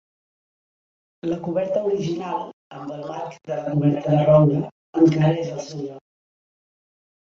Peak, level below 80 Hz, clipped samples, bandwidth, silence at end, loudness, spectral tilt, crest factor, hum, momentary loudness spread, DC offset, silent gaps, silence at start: -4 dBFS; -60 dBFS; under 0.1%; 7.2 kHz; 1.3 s; -21 LUFS; -8.5 dB/octave; 20 dB; none; 17 LU; under 0.1%; 2.53-2.70 s, 4.71-4.93 s; 1.25 s